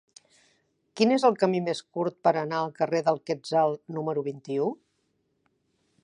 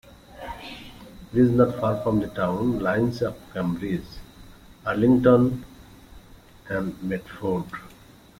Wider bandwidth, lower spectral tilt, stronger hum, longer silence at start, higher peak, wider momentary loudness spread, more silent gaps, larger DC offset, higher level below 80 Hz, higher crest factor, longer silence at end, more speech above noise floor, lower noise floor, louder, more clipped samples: second, 10.5 kHz vs 16 kHz; second, -6 dB/octave vs -8.5 dB/octave; neither; first, 0.95 s vs 0.35 s; about the same, -8 dBFS vs -6 dBFS; second, 10 LU vs 21 LU; neither; neither; second, -78 dBFS vs -48 dBFS; about the same, 20 dB vs 20 dB; first, 1.3 s vs 0.45 s; first, 48 dB vs 27 dB; first, -74 dBFS vs -50 dBFS; second, -27 LUFS vs -24 LUFS; neither